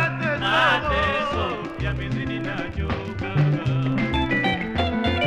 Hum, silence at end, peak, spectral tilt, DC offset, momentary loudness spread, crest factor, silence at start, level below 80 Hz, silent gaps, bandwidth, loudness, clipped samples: none; 0 s; -8 dBFS; -6.5 dB/octave; under 0.1%; 9 LU; 14 dB; 0 s; -36 dBFS; none; 10 kHz; -23 LUFS; under 0.1%